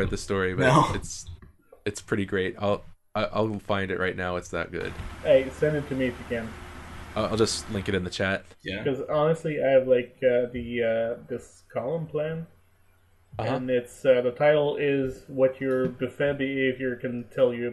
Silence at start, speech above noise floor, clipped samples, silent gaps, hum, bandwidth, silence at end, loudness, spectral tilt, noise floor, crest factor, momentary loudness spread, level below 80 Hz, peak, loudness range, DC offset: 0 s; 34 dB; under 0.1%; none; none; 12 kHz; 0 s; -26 LUFS; -5.5 dB/octave; -60 dBFS; 20 dB; 13 LU; -48 dBFS; -6 dBFS; 4 LU; under 0.1%